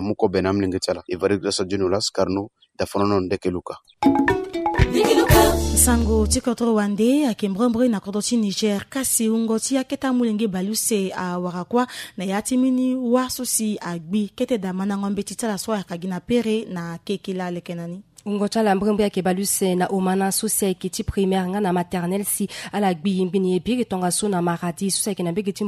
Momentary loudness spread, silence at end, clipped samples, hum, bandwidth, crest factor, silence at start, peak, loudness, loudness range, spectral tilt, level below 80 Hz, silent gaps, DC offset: 8 LU; 0 s; under 0.1%; none; 15.5 kHz; 20 dB; 0 s; -2 dBFS; -21 LUFS; 6 LU; -4.5 dB/octave; -36 dBFS; none; under 0.1%